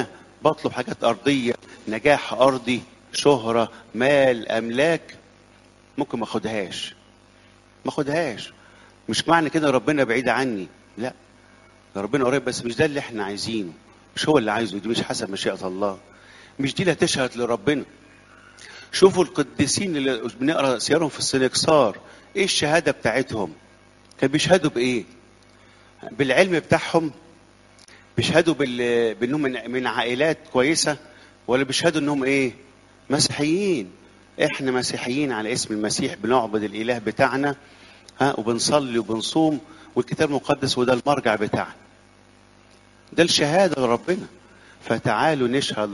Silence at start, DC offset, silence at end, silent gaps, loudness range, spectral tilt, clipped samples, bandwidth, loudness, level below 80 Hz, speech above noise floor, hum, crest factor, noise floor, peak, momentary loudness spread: 0 s; under 0.1%; 0 s; none; 4 LU; -4 dB/octave; under 0.1%; 11.5 kHz; -22 LUFS; -56 dBFS; 31 dB; 50 Hz at -55 dBFS; 22 dB; -53 dBFS; 0 dBFS; 12 LU